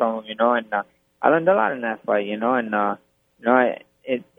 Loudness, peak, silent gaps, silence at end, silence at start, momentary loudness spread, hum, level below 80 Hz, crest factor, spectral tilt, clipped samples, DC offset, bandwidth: -22 LUFS; 0 dBFS; none; 0.15 s; 0 s; 10 LU; none; -74 dBFS; 22 dB; -8 dB/octave; under 0.1%; under 0.1%; 3.8 kHz